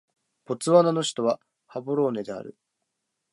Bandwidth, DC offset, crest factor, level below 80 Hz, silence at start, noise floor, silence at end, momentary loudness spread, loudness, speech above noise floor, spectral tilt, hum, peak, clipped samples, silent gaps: 11.5 kHz; under 0.1%; 22 dB; -76 dBFS; 0.5 s; -80 dBFS; 0.8 s; 18 LU; -24 LUFS; 56 dB; -5.5 dB/octave; none; -6 dBFS; under 0.1%; none